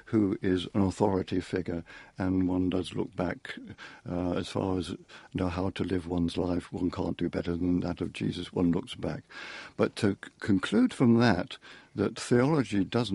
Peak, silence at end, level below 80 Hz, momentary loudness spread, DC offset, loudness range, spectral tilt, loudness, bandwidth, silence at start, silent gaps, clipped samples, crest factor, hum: -8 dBFS; 0 s; -56 dBFS; 14 LU; under 0.1%; 5 LU; -6.5 dB/octave; -30 LUFS; 11.5 kHz; 0.05 s; none; under 0.1%; 20 dB; none